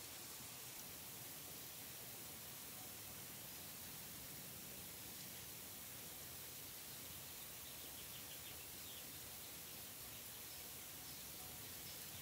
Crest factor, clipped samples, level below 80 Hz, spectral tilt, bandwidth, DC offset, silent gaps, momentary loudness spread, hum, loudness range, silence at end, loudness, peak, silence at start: 14 dB; under 0.1%; -76 dBFS; -1.5 dB/octave; 16 kHz; under 0.1%; none; 1 LU; none; 0 LU; 0 s; -51 LUFS; -38 dBFS; 0 s